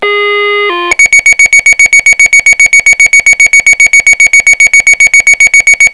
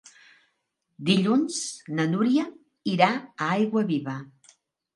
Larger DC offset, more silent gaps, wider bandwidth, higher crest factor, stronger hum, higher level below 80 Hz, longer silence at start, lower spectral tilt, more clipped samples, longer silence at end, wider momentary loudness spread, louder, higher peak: first, 2% vs under 0.1%; neither; about the same, 11 kHz vs 11.5 kHz; second, 4 dB vs 24 dB; neither; first, -36 dBFS vs -74 dBFS; second, 0 s vs 1 s; second, 1 dB/octave vs -5 dB/octave; first, 10% vs under 0.1%; second, 0 s vs 0.7 s; second, 6 LU vs 11 LU; first, -2 LUFS vs -25 LUFS; about the same, 0 dBFS vs -2 dBFS